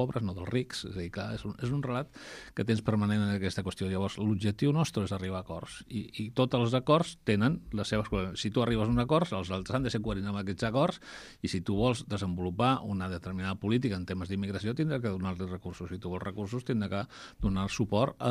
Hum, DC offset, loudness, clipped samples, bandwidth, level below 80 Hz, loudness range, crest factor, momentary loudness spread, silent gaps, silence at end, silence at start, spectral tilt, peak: none; under 0.1%; -32 LUFS; under 0.1%; 13.5 kHz; -50 dBFS; 4 LU; 20 dB; 10 LU; none; 0 s; 0 s; -6.5 dB/octave; -10 dBFS